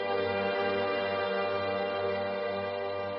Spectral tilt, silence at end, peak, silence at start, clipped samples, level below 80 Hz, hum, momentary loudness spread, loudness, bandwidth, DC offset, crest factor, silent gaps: -2.5 dB/octave; 0 s; -18 dBFS; 0 s; under 0.1%; -72 dBFS; none; 4 LU; -31 LUFS; 5.6 kHz; under 0.1%; 12 dB; none